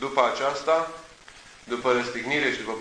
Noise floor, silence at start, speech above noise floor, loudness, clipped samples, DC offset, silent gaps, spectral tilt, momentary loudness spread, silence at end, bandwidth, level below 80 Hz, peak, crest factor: -49 dBFS; 0 s; 23 dB; -25 LUFS; under 0.1%; under 0.1%; none; -3.5 dB/octave; 11 LU; 0 s; 10.5 kHz; -60 dBFS; -4 dBFS; 22 dB